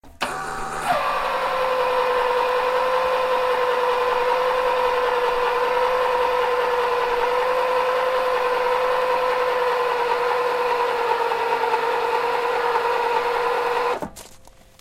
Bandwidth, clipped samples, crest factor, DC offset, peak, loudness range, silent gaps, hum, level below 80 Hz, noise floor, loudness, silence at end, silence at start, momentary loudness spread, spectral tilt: 16 kHz; under 0.1%; 14 dB; under 0.1%; -6 dBFS; 1 LU; none; none; -50 dBFS; -47 dBFS; -21 LUFS; 0.3 s; 0.05 s; 2 LU; -2.5 dB/octave